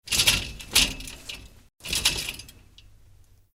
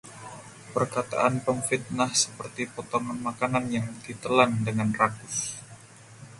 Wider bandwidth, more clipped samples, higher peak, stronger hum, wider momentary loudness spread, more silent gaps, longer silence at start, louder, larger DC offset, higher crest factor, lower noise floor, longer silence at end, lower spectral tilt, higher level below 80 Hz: first, 16 kHz vs 11.5 kHz; neither; about the same, -2 dBFS vs -4 dBFS; neither; first, 20 LU vs 15 LU; neither; about the same, 0.05 s vs 0.05 s; first, -23 LUFS vs -27 LUFS; neither; about the same, 26 dB vs 24 dB; first, -54 dBFS vs -49 dBFS; first, 1.05 s vs 0 s; second, -0.5 dB/octave vs -4 dB/octave; first, -42 dBFS vs -62 dBFS